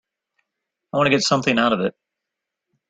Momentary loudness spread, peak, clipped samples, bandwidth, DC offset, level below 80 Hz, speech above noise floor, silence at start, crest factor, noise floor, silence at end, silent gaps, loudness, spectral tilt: 9 LU; -4 dBFS; under 0.1%; 9.4 kHz; under 0.1%; -60 dBFS; 64 dB; 0.95 s; 20 dB; -83 dBFS; 1 s; none; -19 LUFS; -4 dB/octave